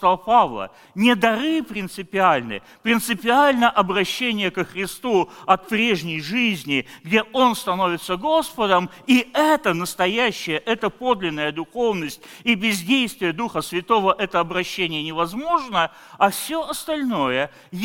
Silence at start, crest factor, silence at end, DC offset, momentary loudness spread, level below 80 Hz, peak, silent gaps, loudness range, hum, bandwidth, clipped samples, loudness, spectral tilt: 0 s; 18 dB; 0 s; under 0.1%; 8 LU; -54 dBFS; -2 dBFS; none; 3 LU; none; 17 kHz; under 0.1%; -21 LUFS; -4 dB/octave